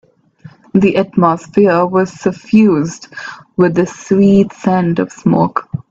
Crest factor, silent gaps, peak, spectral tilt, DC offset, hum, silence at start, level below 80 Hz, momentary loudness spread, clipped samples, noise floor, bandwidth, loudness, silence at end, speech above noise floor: 12 dB; none; 0 dBFS; -7.5 dB/octave; under 0.1%; none; 0.75 s; -48 dBFS; 11 LU; under 0.1%; -40 dBFS; 7.8 kHz; -13 LUFS; 0.1 s; 28 dB